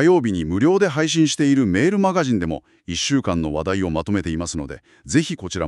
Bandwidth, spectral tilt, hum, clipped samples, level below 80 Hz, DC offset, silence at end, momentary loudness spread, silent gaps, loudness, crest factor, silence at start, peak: 11.5 kHz; -5 dB/octave; none; under 0.1%; -42 dBFS; under 0.1%; 0 s; 10 LU; none; -20 LUFS; 16 dB; 0 s; -4 dBFS